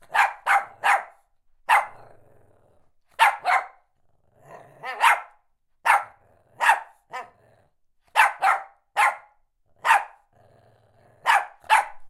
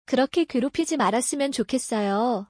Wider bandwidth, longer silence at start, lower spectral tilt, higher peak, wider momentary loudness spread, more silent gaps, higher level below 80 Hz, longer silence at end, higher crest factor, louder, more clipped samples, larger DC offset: first, 16.5 kHz vs 10.5 kHz; about the same, 0.1 s vs 0.1 s; second, 1 dB/octave vs -4 dB/octave; first, -4 dBFS vs -10 dBFS; first, 18 LU vs 3 LU; neither; second, -68 dBFS vs -62 dBFS; about the same, 0 s vs 0.05 s; first, 22 dB vs 14 dB; about the same, -22 LUFS vs -24 LUFS; neither; neither